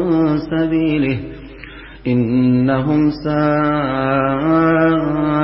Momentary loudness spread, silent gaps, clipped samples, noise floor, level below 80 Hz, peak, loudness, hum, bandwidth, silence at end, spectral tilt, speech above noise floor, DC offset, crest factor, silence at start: 13 LU; none; under 0.1%; -35 dBFS; -40 dBFS; -4 dBFS; -16 LUFS; none; 5.8 kHz; 0 s; -12.5 dB/octave; 20 dB; under 0.1%; 12 dB; 0 s